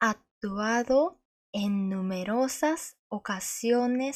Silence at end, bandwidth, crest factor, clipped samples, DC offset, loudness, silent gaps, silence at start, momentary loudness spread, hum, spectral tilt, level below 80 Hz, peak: 0 s; 15 kHz; 16 dB; under 0.1%; under 0.1%; -29 LUFS; 0.31-0.41 s, 1.25-1.53 s, 2.99-3.10 s; 0 s; 10 LU; none; -4.5 dB/octave; -64 dBFS; -12 dBFS